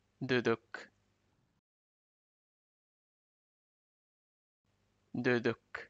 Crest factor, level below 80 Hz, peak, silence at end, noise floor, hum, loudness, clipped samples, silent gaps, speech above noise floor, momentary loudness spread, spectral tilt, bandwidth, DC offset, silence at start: 22 dB; -78 dBFS; -18 dBFS; 0.05 s; -76 dBFS; 50 Hz at -95 dBFS; -34 LUFS; under 0.1%; 1.59-4.65 s; 42 dB; 16 LU; -6.5 dB/octave; 7.8 kHz; under 0.1%; 0.2 s